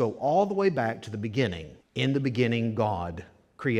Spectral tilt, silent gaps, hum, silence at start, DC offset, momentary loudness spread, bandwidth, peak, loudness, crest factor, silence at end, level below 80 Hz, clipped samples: -7 dB/octave; none; none; 0 s; under 0.1%; 12 LU; 11 kHz; -10 dBFS; -28 LUFS; 16 dB; 0 s; -56 dBFS; under 0.1%